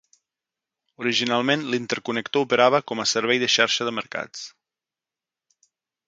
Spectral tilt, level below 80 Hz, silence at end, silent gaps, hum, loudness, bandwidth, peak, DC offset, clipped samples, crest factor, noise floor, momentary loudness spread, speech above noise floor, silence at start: -3 dB/octave; -72 dBFS; 1.6 s; none; none; -22 LUFS; 9.4 kHz; -2 dBFS; under 0.1%; under 0.1%; 24 dB; -90 dBFS; 13 LU; 67 dB; 1 s